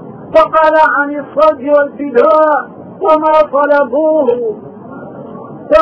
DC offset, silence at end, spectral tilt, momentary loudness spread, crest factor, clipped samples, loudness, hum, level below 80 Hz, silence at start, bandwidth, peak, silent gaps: under 0.1%; 0 s; -6.5 dB/octave; 20 LU; 12 dB; under 0.1%; -11 LUFS; none; -46 dBFS; 0 s; 6 kHz; 0 dBFS; none